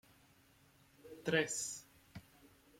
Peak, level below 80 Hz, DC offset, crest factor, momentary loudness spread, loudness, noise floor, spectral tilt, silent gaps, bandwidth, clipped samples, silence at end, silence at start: -20 dBFS; -76 dBFS; under 0.1%; 24 dB; 23 LU; -38 LUFS; -68 dBFS; -3 dB/octave; none; 16.5 kHz; under 0.1%; 0.6 s; 1.05 s